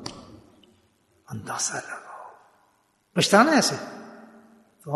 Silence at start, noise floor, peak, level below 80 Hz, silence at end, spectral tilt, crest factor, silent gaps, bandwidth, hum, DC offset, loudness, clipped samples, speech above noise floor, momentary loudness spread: 0 s; -66 dBFS; -4 dBFS; -68 dBFS; 0 s; -3.5 dB/octave; 24 dB; none; 12.5 kHz; none; under 0.1%; -22 LUFS; under 0.1%; 44 dB; 27 LU